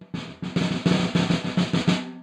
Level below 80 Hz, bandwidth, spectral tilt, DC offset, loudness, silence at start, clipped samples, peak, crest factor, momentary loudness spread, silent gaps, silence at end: -54 dBFS; 10 kHz; -6 dB/octave; under 0.1%; -24 LUFS; 0 s; under 0.1%; -8 dBFS; 16 dB; 8 LU; none; 0 s